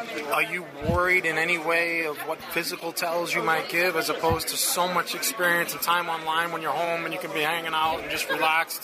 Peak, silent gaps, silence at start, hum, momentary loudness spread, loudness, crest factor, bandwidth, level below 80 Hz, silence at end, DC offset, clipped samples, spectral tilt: -10 dBFS; none; 0 s; none; 6 LU; -25 LUFS; 16 dB; 15.5 kHz; -50 dBFS; 0 s; under 0.1%; under 0.1%; -2.5 dB/octave